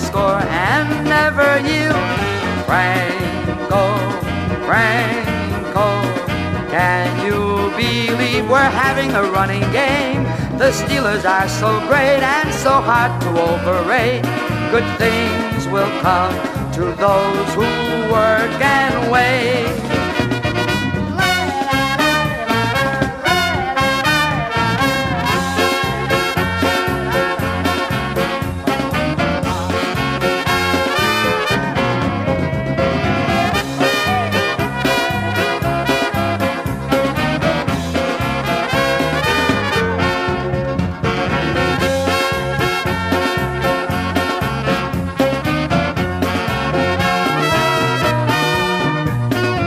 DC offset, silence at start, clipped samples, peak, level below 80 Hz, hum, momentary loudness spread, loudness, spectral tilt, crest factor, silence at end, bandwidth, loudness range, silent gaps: under 0.1%; 0 s; under 0.1%; -2 dBFS; -36 dBFS; none; 5 LU; -16 LUFS; -5 dB/octave; 16 dB; 0 s; 16 kHz; 2 LU; none